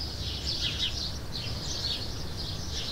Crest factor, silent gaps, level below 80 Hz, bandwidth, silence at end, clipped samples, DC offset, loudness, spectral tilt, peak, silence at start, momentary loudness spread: 16 dB; none; -42 dBFS; 16 kHz; 0 s; under 0.1%; under 0.1%; -32 LUFS; -3 dB/octave; -18 dBFS; 0 s; 6 LU